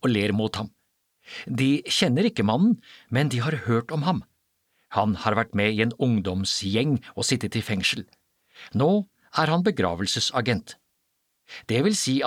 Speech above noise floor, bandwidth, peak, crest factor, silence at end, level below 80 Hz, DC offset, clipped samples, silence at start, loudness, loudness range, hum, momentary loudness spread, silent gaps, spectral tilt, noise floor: 50 dB; 16 kHz; -6 dBFS; 18 dB; 0 s; -58 dBFS; under 0.1%; under 0.1%; 0.05 s; -24 LUFS; 2 LU; none; 8 LU; none; -5 dB/octave; -74 dBFS